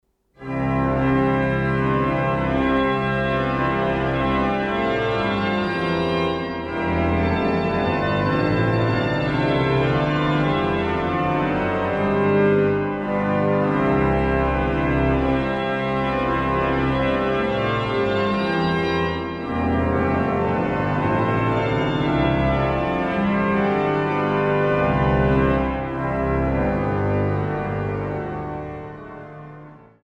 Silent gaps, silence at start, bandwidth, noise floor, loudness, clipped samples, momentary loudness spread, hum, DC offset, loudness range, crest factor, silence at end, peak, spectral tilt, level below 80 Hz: none; 0.4 s; 8.6 kHz; -43 dBFS; -21 LUFS; under 0.1%; 5 LU; none; under 0.1%; 2 LU; 14 dB; 0.25 s; -6 dBFS; -8 dB/octave; -36 dBFS